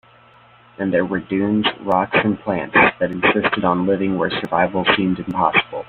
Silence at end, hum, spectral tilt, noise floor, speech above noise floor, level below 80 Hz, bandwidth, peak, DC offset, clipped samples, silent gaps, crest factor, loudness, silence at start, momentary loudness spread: 0.05 s; none; -8 dB/octave; -49 dBFS; 31 dB; -52 dBFS; 4.5 kHz; 0 dBFS; under 0.1%; under 0.1%; none; 18 dB; -18 LUFS; 0.8 s; 6 LU